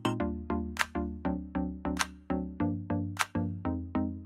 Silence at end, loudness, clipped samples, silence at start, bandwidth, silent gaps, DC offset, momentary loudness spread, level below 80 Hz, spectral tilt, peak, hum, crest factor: 0 s; -34 LUFS; under 0.1%; 0 s; 16 kHz; none; under 0.1%; 3 LU; -46 dBFS; -5.5 dB/octave; -6 dBFS; none; 26 dB